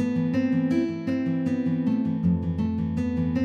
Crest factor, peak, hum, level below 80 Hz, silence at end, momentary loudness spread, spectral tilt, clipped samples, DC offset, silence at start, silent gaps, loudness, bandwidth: 12 dB; -12 dBFS; none; -54 dBFS; 0 s; 3 LU; -9 dB/octave; under 0.1%; under 0.1%; 0 s; none; -25 LUFS; 7 kHz